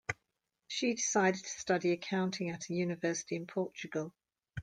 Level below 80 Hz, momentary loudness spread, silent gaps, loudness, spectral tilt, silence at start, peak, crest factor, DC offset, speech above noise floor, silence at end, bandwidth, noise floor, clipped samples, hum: -72 dBFS; 10 LU; none; -35 LUFS; -4 dB/octave; 0.1 s; -16 dBFS; 20 dB; under 0.1%; 51 dB; 0 s; 10 kHz; -85 dBFS; under 0.1%; none